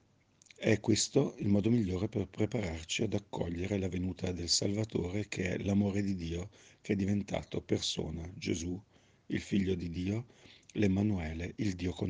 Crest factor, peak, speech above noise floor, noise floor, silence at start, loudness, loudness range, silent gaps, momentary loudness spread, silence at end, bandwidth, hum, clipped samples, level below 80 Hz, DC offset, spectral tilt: 20 dB; -14 dBFS; 33 dB; -67 dBFS; 0.6 s; -34 LUFS; 4 LU; none; 10 LU; 0 s; 10 kHz; none; under 0.1%; -56 dBFS; under 0.1%; -5 dB/octave